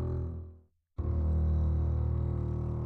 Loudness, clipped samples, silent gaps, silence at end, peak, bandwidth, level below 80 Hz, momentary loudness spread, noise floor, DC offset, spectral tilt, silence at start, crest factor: -32 LUFS; under 0.1%; none; 0 s; -20 dBFS; 2.1 kHz; -34 dBFS; 14 LU; -56 dBFS; under 0.1%; -11.5 dB/octave; 0 s; 10 dB